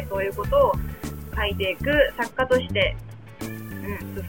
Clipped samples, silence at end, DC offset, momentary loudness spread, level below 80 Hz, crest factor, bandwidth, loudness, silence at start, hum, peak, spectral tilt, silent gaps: under 0.1%; 0 s; 0.3%; 14 LU; -36 dBFS; 18 dB; 17 kHz; -24 LUFS; 0 s; none; -6 dBFS; -5.5 dB/octave; none